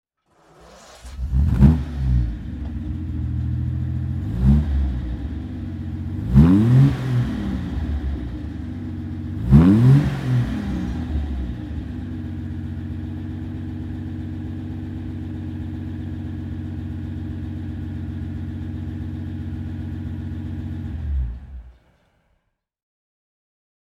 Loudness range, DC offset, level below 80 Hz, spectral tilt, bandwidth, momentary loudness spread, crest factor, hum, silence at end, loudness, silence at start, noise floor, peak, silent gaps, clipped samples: 11 LU; under 0.1%; -28 dBFS; -9.5 dB/octave; 7.8 kHz; 15 LU; 22 dB; none; 2.1 s; -23 LUFS; 0.6 s; -71 dBFS; 0 dBFS; none; under 0.1%